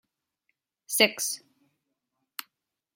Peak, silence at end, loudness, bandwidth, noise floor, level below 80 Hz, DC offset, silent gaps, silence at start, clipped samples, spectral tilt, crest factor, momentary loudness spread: -4 dBFS; 1.6 s; -25 LUFS; 16.5 kHz; -81 dBFS; -86 dBFS; under 0.1%; none; 0.9 s; under 0.1%; -0.5 dB/octave; 28 dB; 19 LU